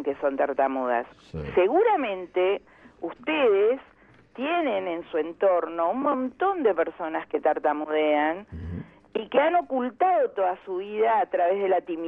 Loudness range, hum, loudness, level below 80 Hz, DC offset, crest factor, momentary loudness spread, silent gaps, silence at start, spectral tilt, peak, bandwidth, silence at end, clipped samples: 1 LU; none; -25 LUFS; -56 dBFS; under 0.1%; 16 dB; 11 LU; none; 0 s; -8 dB/octave; -10 dBFS; 4.9 kHz; 0 s; under 0.1%